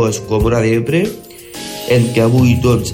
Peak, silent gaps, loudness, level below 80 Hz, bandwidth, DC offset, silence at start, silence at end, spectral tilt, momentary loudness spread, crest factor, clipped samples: -2 dBFS; none; -14 LUFS; -32 dBFS; 17 kHz; under 0.1%; 0 s; 0 s; -6 dB/octave; 16 LU; 12 dB; under 0.1%